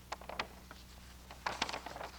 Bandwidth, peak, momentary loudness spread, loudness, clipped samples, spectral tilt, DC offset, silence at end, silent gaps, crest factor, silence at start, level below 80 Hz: over 20 kHz; -18 dBFS; 15 LU; -42 LUFS; under 0.1%; -2.5 dB/octave; under 0.1%; 0 s; none; 26 dB; 0 s; -58 dBFS